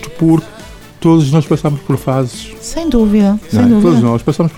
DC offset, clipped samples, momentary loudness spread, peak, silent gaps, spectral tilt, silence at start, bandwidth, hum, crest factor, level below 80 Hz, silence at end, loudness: under 0.1%; under 0.1%; 11 LU; 0 dBFS; none; -7.5 dB/octave; 0 s; 15.5 kHz; none; 10 dB; -32 dBFS; 0 s; -12 LUFS